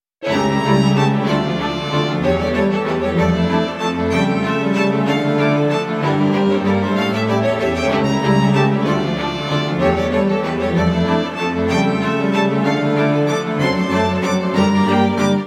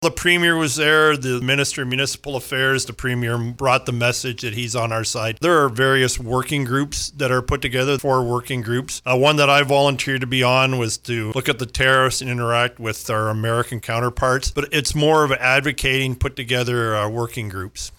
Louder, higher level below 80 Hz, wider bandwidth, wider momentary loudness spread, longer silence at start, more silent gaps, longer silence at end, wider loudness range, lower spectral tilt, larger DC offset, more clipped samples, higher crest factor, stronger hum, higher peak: about the same, -17 LUFS vs -19 LUFS; about the same, -40 dBFS vs -40 dBFS; second, 12.5 kHz vs 20 kHz; second, 4 LU vs 8 LU; first, 0.2 s vs 0 s; neither; about the same, 0 s vs 0.1 s; about the same, 1 LU vs 3 LU; first, -6.5 dB/octave vs -4 dB/octave; neither; neither; about the same, 14 dB vs 16 dB; neither; about the same, -2 dBFS vs -4 dBFS